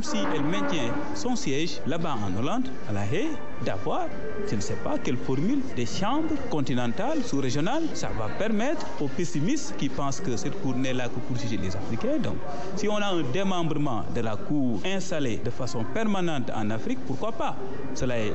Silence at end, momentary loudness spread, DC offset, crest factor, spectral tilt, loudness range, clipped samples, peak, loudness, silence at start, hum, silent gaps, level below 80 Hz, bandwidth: 0 s; 5 LU; 6%; 12 dB; -5.5 dB/octave; 2 LU; under 0.1%; -14 dBFS; -29 LUFS; 0 s; none; none; -50 dBFS; 8.4 kHz